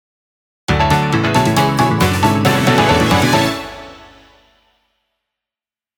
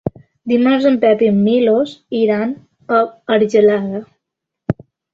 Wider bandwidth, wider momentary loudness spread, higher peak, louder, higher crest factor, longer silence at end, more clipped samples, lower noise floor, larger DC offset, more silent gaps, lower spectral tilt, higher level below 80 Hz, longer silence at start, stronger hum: first, over 20 kHz vs 7.4 kHz; second, 11 LU vs 14 LU; about the same, 0 dBFS vs -2 dBFS; about the same, -14 LUFS vs -15 LUFS; about the same, 16 dB vs 14 dB; first, 2.05 s vs 0.4 s; neither; first, under -90 dBFS vs -80 dBFS; neither; neither; second, -5 dB/octave vs -7.5 dB/octave; first, -34 dBFS vs -52 dBFS; first, 0.7 s vs 0.05 s; neither